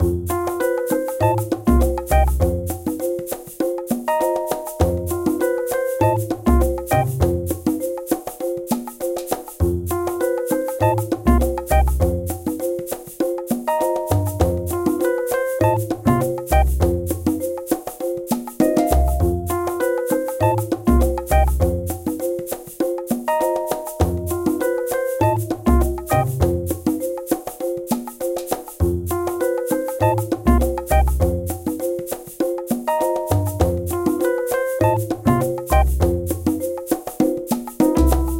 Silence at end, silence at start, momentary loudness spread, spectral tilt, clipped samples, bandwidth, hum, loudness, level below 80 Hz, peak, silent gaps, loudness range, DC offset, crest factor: 0 s; 0 s; 7 LU; -7 dB/octave; under 0.1%; 17 kHz; none; -21 LUFS; -26 dBFS; -2 dBFS; none; 3 LU; under 0.1%; 18 dB